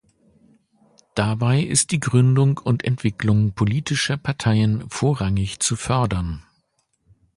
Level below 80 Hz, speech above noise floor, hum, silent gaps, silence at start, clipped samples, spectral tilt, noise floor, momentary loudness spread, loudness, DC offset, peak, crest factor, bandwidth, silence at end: -42 dBFS; 49 dB; none; none; 1.15 s; under 0.1%; -5 dB/octave; -68 dBFS; 6 LU; -21 LUFS; under 0.1%; -2 dBFS; 18 dB; 11.5 kHz; 0.95 s